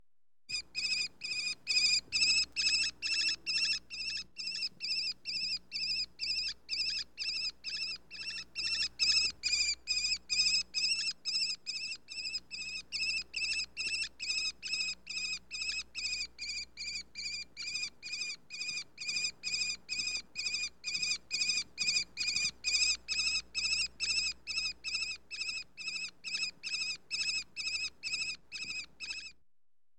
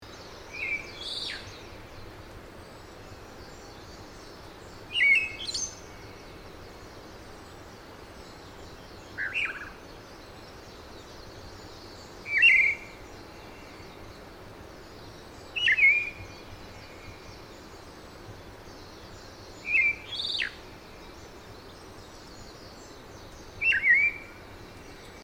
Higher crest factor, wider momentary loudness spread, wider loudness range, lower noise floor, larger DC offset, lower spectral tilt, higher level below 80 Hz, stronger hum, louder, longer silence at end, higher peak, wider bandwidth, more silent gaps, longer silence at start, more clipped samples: about the same, 18 dB vs 22 dB; second, 10 LU vs 26 LU; second, 7 LU vs 16 LU; first, -90 dBFS vs -46 dBFS; first, 0.1% vs under 0.1%; second, 2 dB/octave vs -1.5 dB/octave; second, -64 dBFS vs -54 dBFS; neither; second, -33 LUFS vs -24 LUFS; first, 0.65 s vs 0 s; second, -18 dBFS vs -10 dBFS; about the same, 16.5 kHz vs 17 kHz; neither; first, 0.5 s vs 0 s; neither